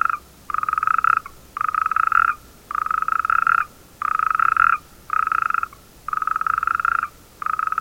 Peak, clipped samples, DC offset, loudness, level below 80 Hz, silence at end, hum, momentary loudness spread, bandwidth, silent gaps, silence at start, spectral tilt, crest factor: -2 dBFS; under 0.1%; under 0.1%; -20 LUFS; -52 dBFS; 0 s; none; 12 LU; 17 kHz; none; 0 s; -2.5 dB/octave; 20 dB